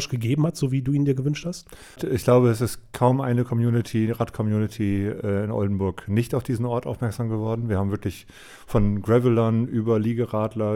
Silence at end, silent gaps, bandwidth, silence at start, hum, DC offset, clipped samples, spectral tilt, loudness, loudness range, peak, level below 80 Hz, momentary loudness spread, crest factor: 0 s; none; 16 kHz; 0 s; none; under 0.1%; under 0.1%; -7.5 dB/octave; -24 LUFS; 3 LU; -6 dBFS; -44 dBFS; 8 LU; 16 dB